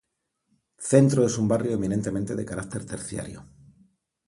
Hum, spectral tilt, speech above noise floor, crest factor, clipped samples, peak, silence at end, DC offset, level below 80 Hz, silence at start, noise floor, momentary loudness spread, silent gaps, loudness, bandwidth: none; -6.5 dB/octave; 54 dB; 22 dB; under 0.1%; -4 dBFS; 0.85 s; under 0.1%; -54 dBFS; 0.8 s; -78 dBFS; 16 LU; none; -25 LUFS; 11.5 kHz